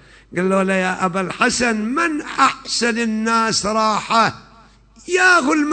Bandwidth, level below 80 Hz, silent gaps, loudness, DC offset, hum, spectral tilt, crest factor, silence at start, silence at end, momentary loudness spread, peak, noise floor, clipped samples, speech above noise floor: 9.2 kHz; -50 dBFS; none; -17 LUFS; under 0.1%; none; -3.5 dB/octave; 16 dB; 0.3 s; 0 s; 7 LU; -2 dBFS; -48 dBFS; under 0.1%; 30 dB